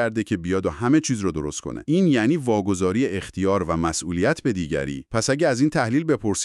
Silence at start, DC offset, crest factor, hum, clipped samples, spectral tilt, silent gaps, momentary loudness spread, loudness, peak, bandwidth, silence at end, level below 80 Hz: 0 s; under 0.1%; 16 dB; none; under 0.1%; -5.5 dB/octave; none; 6 LU; -22 LUFS; -6 dBFS; 12 kHz; 0 s; -46 dBFS